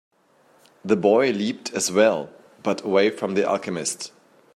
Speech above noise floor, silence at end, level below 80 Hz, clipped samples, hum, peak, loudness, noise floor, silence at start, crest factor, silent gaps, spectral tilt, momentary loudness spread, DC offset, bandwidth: 37 dB; 0.5 s; -72 dBFS; under 0.1%; none; -4 dBFS; -22 LUFS; -59 dBFS; 0.85 s; 20 dB; none; -4 dB/octave; 13 LU; under 0.1%; 14.5 kHz